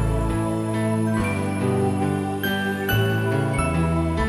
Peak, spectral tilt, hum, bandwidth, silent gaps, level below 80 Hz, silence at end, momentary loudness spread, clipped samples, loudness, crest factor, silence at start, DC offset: -10 dBFS; -6.5 dB/octave; none; 13.5 kHz; none; -34 dBFS; 0 s; 2 LU; under 0.1%; -23 LUFS; 12 dB; 0 s; under 0.1%